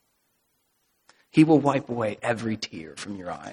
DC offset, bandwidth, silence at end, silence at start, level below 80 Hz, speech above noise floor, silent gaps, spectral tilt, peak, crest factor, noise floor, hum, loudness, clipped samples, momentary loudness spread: under 0.1%; 11 kHz; 0 s; 1.35 s; -64 dBFS; 48 dB; none; -6.5 dB/octave; -4 dBFS; 22 dB; -72 dBFS; none; -24 LUFS; under 0.1%; 17 LU